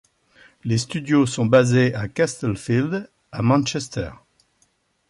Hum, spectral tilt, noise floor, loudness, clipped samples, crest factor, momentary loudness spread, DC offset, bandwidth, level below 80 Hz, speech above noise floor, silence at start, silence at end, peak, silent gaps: none; -6 dB/octave; -65 dBFS; -21 LUFS; under 0.1%; 18 dB; 13 LU; under 0.1%; 11.5 kHz; -50 dBFS; 45 dB; 0.65 s; 0.95 s; -4 dBFS; none